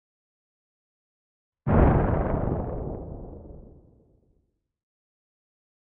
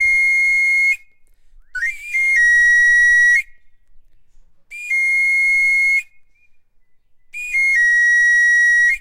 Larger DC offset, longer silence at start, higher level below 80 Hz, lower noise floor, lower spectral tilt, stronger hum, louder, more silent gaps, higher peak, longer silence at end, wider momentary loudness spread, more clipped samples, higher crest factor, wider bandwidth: neither; first, 1.65 s vs 0 s; first, -36 dBFS vs -48 dBFS; first, -72 dBFS vs -51 dBFS; first, -13 dB/octave vs 4.5 dB/octave; neither; second, -25 LUFS vs -12 LUFS; neither; about the same, -8 dBFS vs -6 dBFS; first, 2.3 s vs 0 s; first, 23 LU vs 13 LU; neither; first, 22 dB vs 12 dB; second, 3.6 kHz vs 16 kHz